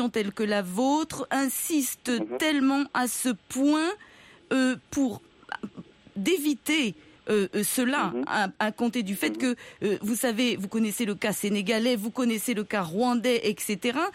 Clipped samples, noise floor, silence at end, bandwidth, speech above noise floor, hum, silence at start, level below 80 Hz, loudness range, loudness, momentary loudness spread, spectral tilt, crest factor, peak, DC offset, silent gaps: under 0.1%; -47 dBFS; 0.05 s; 16 kHz; 20 dB; none; 0 s; -66 dBFS; 2 LU; -27 LUFS; 5 LU; -3.5 dB/octave; 16 dB; -10 dBFS; under 0.1%; none